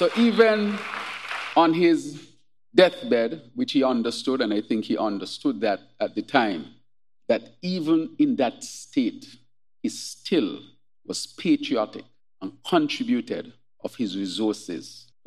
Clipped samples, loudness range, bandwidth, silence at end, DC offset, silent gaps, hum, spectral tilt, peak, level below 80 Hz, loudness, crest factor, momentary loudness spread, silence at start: under 0.1%; 6 LU; 13 kHz; 0.25 s; 0.1%; none; none; -5 dB/octave; -2 dBFS; -78 dBFS; -24 LUFS; 24 dB; 18 LU; 0 s